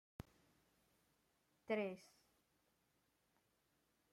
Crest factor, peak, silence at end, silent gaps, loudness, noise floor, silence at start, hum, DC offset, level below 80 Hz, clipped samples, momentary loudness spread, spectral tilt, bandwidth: 26 dB; -28 dBFS; 2.05 s; none; -45 LUFS; -83 dBFS; 1.7 s; none; under 0.1%; -80 dBFS; under 0.1%; 20 LU; -6 dB/octave; 16 kHz